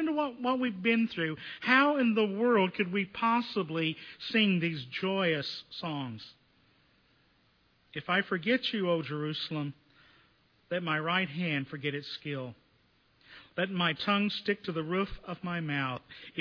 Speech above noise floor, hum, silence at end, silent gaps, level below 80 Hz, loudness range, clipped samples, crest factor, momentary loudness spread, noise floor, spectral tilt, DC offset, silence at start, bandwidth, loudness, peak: 37 dB; none; 0 s; none; -62 dBFS; 7 LU; under 0.1%; 22 dB; 12 LU; -68 dBFS; -7 dB/octave; under 0.1%; 0 s; 5.4 kHz; -31 LUFS; -10 dBFS